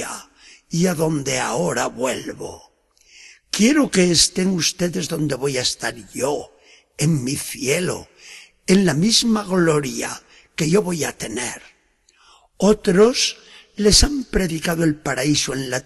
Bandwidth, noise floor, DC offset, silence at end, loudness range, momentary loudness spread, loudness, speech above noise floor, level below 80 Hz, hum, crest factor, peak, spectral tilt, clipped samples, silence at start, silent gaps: 12.5 kHz; -59 dBFS; under 0.1%; 0.05 s; 5 LU; 16 LU; -19 LUFS; 40 dB; -38 dBFS; none; 18 dB; -2 dBFS; -4 dB/octave; under 0.1%; 0 s; none